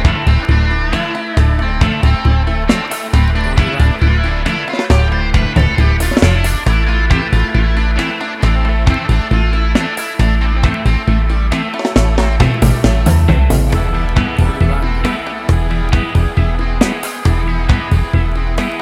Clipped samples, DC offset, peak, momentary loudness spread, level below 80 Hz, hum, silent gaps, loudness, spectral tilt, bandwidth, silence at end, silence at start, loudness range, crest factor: under 0.1%; under 0.1%; 0 dBFS; 5 LU; -14 dBFS; none; none; -14 LUFS; -6 dB/octave; 15 kHz; 0 s; 0 s; 2 LU; 12 dB